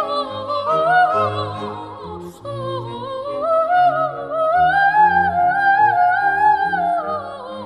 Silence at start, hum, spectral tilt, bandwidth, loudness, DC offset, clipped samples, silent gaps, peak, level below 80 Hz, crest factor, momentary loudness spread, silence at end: 0 s; none; -6 dB/octave; 10.5 kHz; -17 LUFS; under 0.1%; under 0.1%; none; -4 dBFS; -52 dBFS; 14 dB; 15 LU; 0 s